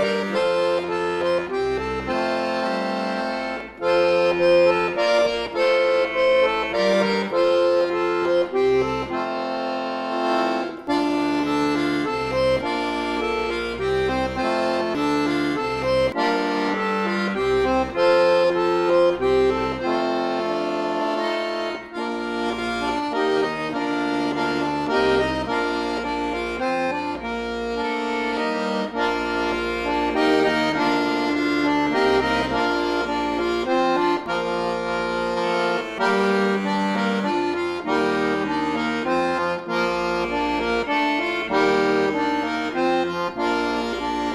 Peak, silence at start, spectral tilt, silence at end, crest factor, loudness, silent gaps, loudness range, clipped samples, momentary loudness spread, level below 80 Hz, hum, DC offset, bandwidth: -6 dBFS; 0 s; -5 dB/octave; 0 s; 16 dB; -22 LUFS; none; 4 LU; under 0.1%; 6 LU; -48 dBFS; none; under 0.1%; 12.5 kHz